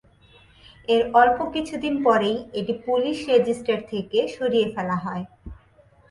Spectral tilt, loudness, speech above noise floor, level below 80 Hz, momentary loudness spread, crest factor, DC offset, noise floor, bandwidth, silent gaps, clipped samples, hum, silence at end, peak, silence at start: -5.5 dB/octave; -22 LUFS; 34 dB; -52 dBFS; 10 LU; 20 dB; under 0.1%; -55 dBFS; 11.5 kHz; none; under 0.1%; none; 0.55 s; -4 dBFS; 0.9 s